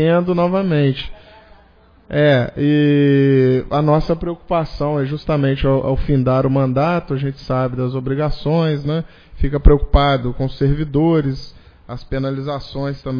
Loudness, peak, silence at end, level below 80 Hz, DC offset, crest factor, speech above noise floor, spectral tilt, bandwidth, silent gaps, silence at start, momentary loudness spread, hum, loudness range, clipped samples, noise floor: -17 LUFS; 0 dBFS; 0 s; -26 dBFS; under 0.1%; 16 dB; 33 dB; -9.5 dB/octave; 5.2 kHz; none; 0 s; 10 LU; none; 3 LU; under 0.1%; -49 dBFS